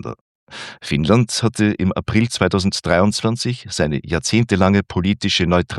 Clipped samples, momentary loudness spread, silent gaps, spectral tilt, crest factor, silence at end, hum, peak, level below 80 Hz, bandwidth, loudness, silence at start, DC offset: under 0.1%; 7 LU; 0.21-0.47 s; -5 dB/octave; 18 dB; 0 s; none; 0 dBFS; -44 dBFS; 12.5 kHz; -18 LUFS; 0.05 s; under 0.1%